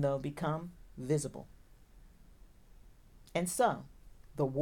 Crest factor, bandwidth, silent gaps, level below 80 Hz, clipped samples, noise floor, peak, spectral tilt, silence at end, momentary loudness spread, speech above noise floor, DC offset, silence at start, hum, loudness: 20 dB; 18.5 kHz; none; -58 dBFS; under 0.1%; -58 dBFS; -16 dBFS; -5.5 dB/octave; 0 s; 19 LU; 24 dB; under 0.1%; 0 s; none; -35 LUFS